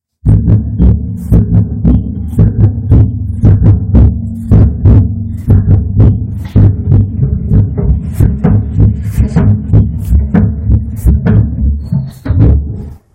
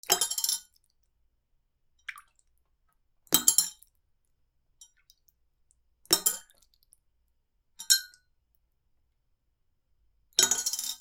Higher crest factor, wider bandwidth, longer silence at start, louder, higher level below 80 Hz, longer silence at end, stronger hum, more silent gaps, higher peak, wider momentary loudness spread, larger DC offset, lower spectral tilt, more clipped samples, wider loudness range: second, 8 dB vs 32 dB; second, 2.7 kHz vs 19.5 kHz; first, 0.25 s vs 0.1 s; first, -10 LUFS vs -25 LUFS; first, -14 dBFS vs -72 dBFS; first, 0.2 s vs 0.05 s; neither; neither; about the same, 0 dBFS vs -2 dBFS; second, 7 LU vs 22 LU; neither; first, -10.5 dB/octave vs 1 dB/octave; first, 3% vs under 0.1%; about the same, 2 LU vs 4 LU